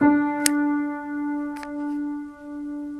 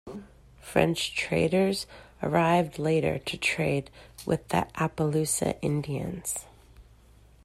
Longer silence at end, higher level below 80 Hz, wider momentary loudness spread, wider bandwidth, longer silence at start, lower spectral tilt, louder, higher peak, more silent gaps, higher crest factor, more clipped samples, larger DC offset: second, 0 s vs 0.65 s; second, -60 dBFS vs -54 dBFS; about the same, 13 LU vs 11 LU; second, 13.5 kHz vs 15 kHz; about the same, 0 s vs 0.05 s; second, -3 dB/octave vs -5 dB/octave; about the same, -26 LUFS vs -28 LUFS; first, 0 dBFS vs -8 dBFS; neither; about the same, 24 dB vs 22 dB; neither; neither